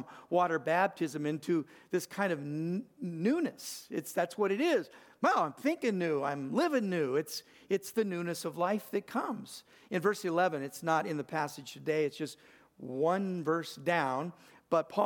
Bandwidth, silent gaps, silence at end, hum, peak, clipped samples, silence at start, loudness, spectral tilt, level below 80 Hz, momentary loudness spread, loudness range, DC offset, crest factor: 19 kHz; none; 0 s; none; -14 dBFS; under 0.1%; 0 s; -33 LUFS; -5.5 dB/octave; -84 dBFS; 10 LU; 3 LU; under 0.1%; 18 dB